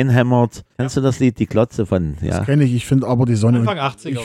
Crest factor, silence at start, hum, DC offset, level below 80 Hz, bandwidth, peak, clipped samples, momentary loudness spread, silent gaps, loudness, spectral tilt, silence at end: 14 dB; 0 s; none; under 0.1%; -40 dBFS; 12.5 kHz; -2 dBFS; under 0.1%; 7 LU; none; -17 LUFS; -7.5 dB/octave; 0 s